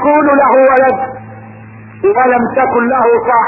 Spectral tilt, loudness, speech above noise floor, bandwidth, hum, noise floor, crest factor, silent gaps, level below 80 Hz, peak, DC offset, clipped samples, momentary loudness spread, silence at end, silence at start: -10 dB/octave; -10 LUFS; 23 dB; 3.5 kHz; none; -32 dBFS; 10 dB; none; -48 dBFS; 0 dBFS; under 0.1%; under 0.1%; 10 LU; 0 s; 0 s